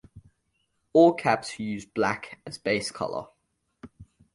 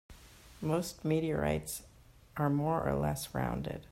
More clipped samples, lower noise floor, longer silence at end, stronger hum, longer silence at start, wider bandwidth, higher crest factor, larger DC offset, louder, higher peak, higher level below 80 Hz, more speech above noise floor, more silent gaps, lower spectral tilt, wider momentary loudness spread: neither; first, -76 dBFS vs -55 dBFS; first, 0.3 s vs 0.05 s; neither; about the same, 0.15 s vs 0.1 s; second, 11.5 kHz vs 16 kHz; first, 22 dB vs 16 dB; neither; first, -26 LUFS vs -34 LUFS; first, -6 dBFS vs -18 dBFS; second, -62 dBFS vs -52 dBFS; first, 50 dB vs 22 dB; neither; about the same, -5 dB/octave vs -6 dB/octave; first, 15 LU vs 9 LU